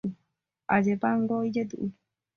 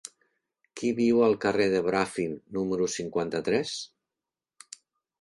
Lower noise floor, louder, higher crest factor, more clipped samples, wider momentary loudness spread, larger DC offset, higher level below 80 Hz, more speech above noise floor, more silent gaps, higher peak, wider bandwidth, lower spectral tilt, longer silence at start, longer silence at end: second, -78 dBFS vs -90 dBFS; about the same, -28 LUFS vs -27 LUFS; about the same, 20 dB vs 18 dB; neither; second, 12 LU vs 24 LU; neither; about the same, -66 dBFS vs -64 dBFS; second, 52 dB vs 64 dB; neither; about the same, -8 dBFS vs -10 dBFS; second, 6.6 kHz vs 11.5 kHz; first, -8 dB/octave vs -5 dB/octave; second, 0.05 s vs 0.75 s; second, 0.45 s vs 1.35 s